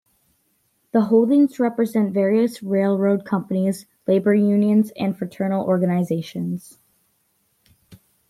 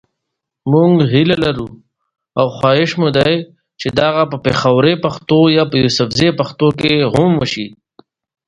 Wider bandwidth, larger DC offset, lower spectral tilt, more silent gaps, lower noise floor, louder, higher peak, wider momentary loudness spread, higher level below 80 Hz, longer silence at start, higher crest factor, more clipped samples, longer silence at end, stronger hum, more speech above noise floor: first, 14 kHz vs 11 kHz; neither; first, -8 dB/octave vs -6.5 dB/octave; neither; second, -67 dBFS vs -77 dBFS; second, -20 LUFS vs -14 LUFS; second, -6 dBFS vs 0 dBFS; about the same, 9 LU vs 9 LU; second, -68 dBFS vs -44 dBFS; first, 0.95 s vs 0.65 s; about the same, 16 dB vs 14 dB; neither; second, 0.35 s vs 0.75 s; neither; second, 48 dB vs 64 dB